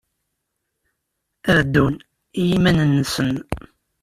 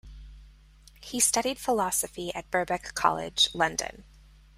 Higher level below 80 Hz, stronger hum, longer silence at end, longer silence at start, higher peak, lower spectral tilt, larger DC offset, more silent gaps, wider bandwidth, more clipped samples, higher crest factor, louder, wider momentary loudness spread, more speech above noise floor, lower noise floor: first, -42 dBFS vs -52 dBFS; neither; about the same, 0.45 s vs 0.55 s; first, 1.45 s vs 0.05 s; first, -2 dBFS vs -6 dBFS; first, -6 dB/octave vs -1.5 dB/octave; neither; neither; about the same, 15 kHz vs 16 kHz; neither; second, 18 dB vs 24 dB; first, -19 LUFS vs -27 LUFS; first, 16 LU vs 12 LU; first, 59 dB vs 26 dB; first, -77 dBFS vs -54 dBFS